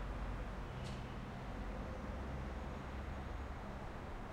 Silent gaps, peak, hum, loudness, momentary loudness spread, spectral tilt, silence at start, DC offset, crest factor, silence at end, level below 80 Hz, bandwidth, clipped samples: none; -32 dBFS; none; -47 LUFS; 2 LU; -6.5 dB/octave; 0 s; under 0.1%; 12 dB; 0 s; -48 dBFS; 12.5 kHz; under 0.1%